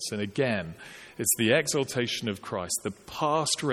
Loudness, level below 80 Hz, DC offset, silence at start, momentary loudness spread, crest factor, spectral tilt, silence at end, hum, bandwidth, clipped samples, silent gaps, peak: -28 LUFS; -62 dBFS; under 0.1%; 0 s; 12 LU; 20 dB; -3 dB/octave; 0 s; none; 18 kHz; under 0.1%; none; -8 dBFS